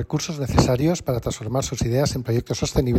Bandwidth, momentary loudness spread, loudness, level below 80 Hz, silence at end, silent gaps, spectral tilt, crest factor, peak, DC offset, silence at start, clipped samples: 16 kHz; 6 LU; -23 LUFS; -36 dBFS; 0 s; none; -5.5 dB/octave; 18 dB; -4 dBFS; under 0.1%; 0 s; under 0.1%